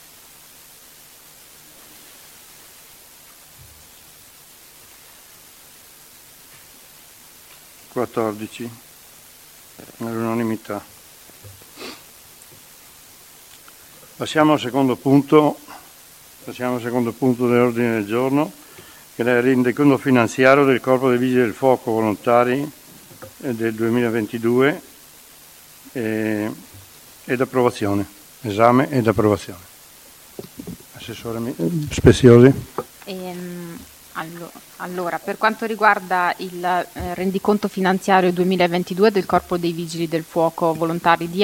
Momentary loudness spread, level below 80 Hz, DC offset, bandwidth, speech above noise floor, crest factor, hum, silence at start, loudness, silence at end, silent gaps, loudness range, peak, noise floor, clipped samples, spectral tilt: 21 LU; -48 dBFS; under 0.1%; 17 kHz; 28 dB; 20 dB; none; 7.95 s; -19 LUFS; 0 s; none; 13 LU; 0 dBFS; -46 dBFS; under 0.1%; -6 dB/octave